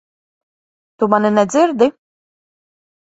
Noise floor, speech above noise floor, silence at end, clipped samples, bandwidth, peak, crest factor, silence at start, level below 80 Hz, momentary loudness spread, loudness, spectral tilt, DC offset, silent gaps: under -90 dBFS; over 76 dB; 1.15 s; under 0.1%; 8 kHz; 0 dBFS; 18 dB; 1 s; -62 dBFS; 4 LU; -15 LUFS; -5.5 dB/octave; under 0.1%; none